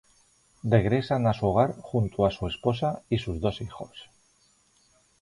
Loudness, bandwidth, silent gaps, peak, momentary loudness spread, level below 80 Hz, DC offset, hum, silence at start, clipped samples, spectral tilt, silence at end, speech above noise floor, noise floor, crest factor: -27 LUFS; 11 kHz; none; -8 dBFS; 14 LU; -48 dBFS; under 0.1%; none; 0.65 s; under 0.1%; -8 dB/octave; 1.2 s; 39 dB; -65 dBFS; 20 dB